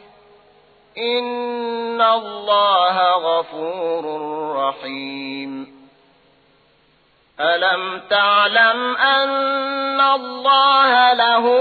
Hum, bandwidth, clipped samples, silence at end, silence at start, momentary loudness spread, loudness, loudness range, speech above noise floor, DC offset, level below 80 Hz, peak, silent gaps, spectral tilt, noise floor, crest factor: none; 4.8 kHz; under 0.1%; 0 s; 0.95 s; 14 LU; -17 LUFS; 11 LU; 40 dB; under 0.1%; -72 dBFS; -4 dBFS; none; -5 dB/octave; -58 dBFS; 16 dB